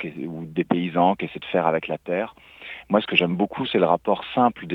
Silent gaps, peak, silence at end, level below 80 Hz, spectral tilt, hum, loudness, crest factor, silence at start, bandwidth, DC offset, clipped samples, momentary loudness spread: none; -4 dBFS; 0 s; -60 dBFS; -8 dB/octave; none; -23 LUFS; 20 dB; 0 s; 5.6 kHz; under 0.1%; under 0.1%; 13 LU